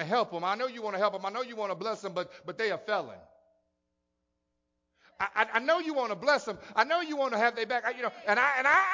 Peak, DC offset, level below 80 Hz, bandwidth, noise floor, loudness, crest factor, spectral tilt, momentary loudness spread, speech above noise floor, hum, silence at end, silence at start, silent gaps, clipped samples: -10 dBFS; under 0.1%; -74 dBFS; 7.6 kHz; -81 dBFS; -29 LUFS; 22 dB; -3.5 dB/octave; 9 LU; 51 dB; none; 0 s; 0 s; none; under 0.1%